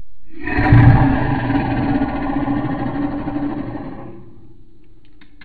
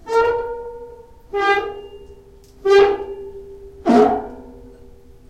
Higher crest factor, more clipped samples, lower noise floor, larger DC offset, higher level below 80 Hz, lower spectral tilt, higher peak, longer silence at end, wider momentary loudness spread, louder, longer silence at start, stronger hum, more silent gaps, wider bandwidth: about the same, 18 dB vs 18 dB; neither; about the same, -48 dBFS vs -45 dBFS; neither; first, -28 dBFS vs -46 dBFS; first, -10.5 dB/octave vs -5 dB/octave; about the same, 0 dBFS vs -2 dBFS; second, 0 s vs 0.6 s; second, 19 LU vs 24 LU; about the same, -17 LUFS vs -17 LUFS; about the same, 0 s vs 0.05 s; neither; neither; second, 4.7 kHz vs 9.2 kHz